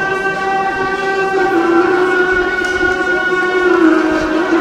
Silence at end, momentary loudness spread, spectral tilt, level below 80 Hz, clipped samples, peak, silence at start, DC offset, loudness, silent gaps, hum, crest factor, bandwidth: 0 s; 5 LU; -4.5 dB/octave; -40 dBFS; under 0.1%; 0 dBFS; 0 s; 0.2%; -13 LUFS; none; none; 14 dB; 11 kHz